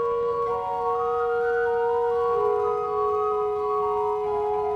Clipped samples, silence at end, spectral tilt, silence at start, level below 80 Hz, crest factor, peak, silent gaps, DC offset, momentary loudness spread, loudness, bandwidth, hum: under 0.1%; 0 s; -6 dB/octave; 0 s; -54 dBFS; 12 dB; -12 dBFS; none; under 0.1%; 3 LU; -25 LUFS; 6.6 kHz; none